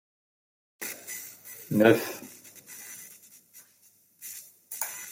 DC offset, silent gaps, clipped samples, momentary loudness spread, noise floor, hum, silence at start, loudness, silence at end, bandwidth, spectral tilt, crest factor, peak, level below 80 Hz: under 0.1%; none; under 0.1%; 25 LU; -62 dBFS; none; 0.8 s; -28 LUFS; 0 s; 16.5 kHz; -4.5 dB/octave; 26 dB; -6 dBFS; -76 dBFS